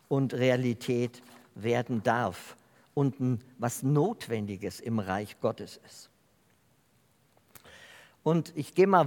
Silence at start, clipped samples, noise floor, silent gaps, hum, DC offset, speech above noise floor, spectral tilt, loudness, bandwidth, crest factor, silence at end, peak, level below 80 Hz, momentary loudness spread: 0.1 s; under 0.1%; -67 dBFS; none; none; under 0.1%; 38 dB; -6.5 dB/octave; -30 LUFS; 18 kHz; 22 dB; 0 s; -8 dBFS; -76 dBFS; 22 LU